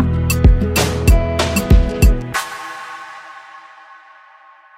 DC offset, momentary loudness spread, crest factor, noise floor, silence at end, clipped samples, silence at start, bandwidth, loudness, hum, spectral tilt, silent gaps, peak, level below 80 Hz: under 0.1%; 19 LU; 14 dB; -45 dBFS; 1.2 s; under 0.1%; 0 s; 16.5 kHz; -15 LUFS; none; -5.5 dB/octave; none; -2 dBFS; -18 dBFS